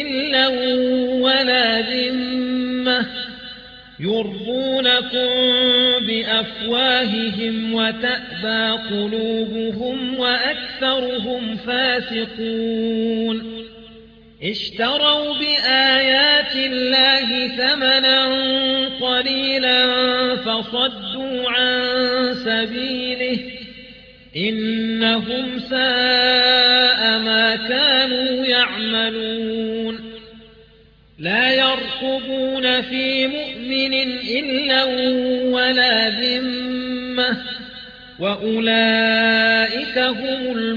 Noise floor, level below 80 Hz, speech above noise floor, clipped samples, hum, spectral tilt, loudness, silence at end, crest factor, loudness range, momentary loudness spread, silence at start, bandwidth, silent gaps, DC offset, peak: -50 dBFS; -54 dBFS; 31 dB; under 0.1%; none; -5 dB/octave; -17 LUFS; 0 s; 16 dB; 7 LU; 11 LU; 0 s; 5.4 kHz; none; under 0.1%; -4 dBFS